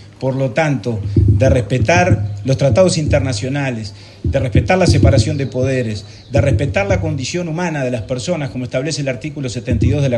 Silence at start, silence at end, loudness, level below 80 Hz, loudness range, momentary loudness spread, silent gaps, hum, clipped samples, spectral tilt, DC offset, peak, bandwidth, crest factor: 0 s; 0 s; -16 LUFS; -30 dBFS; 4 LU; 9 LU; none; none; under 0.1%; -6 dB/octave; under 0.1%; 0 dBFS; 10.5 kHz; 14 dB